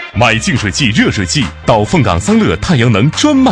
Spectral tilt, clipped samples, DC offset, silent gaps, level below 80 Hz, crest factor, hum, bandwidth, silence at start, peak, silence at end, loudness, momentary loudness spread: -5 dB/octave; 0.1%; under 0.1%; none; -30 dBFS; 10 dB; none; 10.5 kHz; 0 s; 0 dBFS; 0 s; -11 LUFS; 3 LU